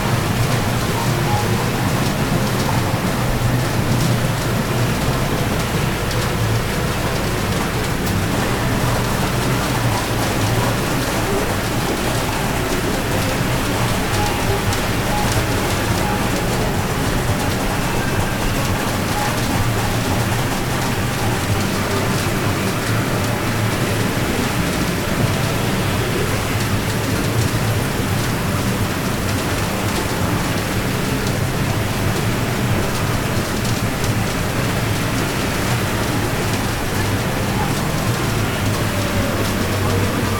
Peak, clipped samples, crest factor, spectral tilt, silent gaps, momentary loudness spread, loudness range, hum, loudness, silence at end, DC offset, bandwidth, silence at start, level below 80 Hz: -4 dBFS; under 0.1%; 14 dB; -5 dB/octave; none; 2 LU; 1 LU; none; -19 LUFS; 0 s; under 0.1%; 19 kHz; 0 s; -30 dBFS